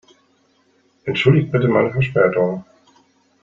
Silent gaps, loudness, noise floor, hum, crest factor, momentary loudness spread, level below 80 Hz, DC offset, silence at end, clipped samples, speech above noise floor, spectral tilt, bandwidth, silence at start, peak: none; -17 LUFS; -60 dBFS; none; 18 dB; 10 LU; -52 dBFS; under 0.1%; 0.8 s; under 0.1%; 43 dB; -8 dB/octave; 7.2 kHz; 1.05 s; -2 dBFS